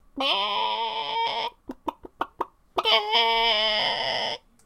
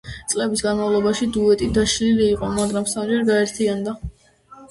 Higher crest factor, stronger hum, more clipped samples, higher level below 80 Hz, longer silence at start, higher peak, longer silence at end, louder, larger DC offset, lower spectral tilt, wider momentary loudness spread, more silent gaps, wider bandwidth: first, 20 dB vs 14 dB; neither; neither; second, -56 dBFS vs -40 dBFS; about the same, 0.15 s vs 0.05 s; about the same, -6 dBFS vs -6 dBFS; first, 0.3 s vs 0.05 s; second, -24 LUFS vs -20 LUFS; neither; second, -2 dB/octave vs -4.5 dB/octave; first, 16 LU vs 7 LU; neither; first, 15 kHz vs 11.5 kHz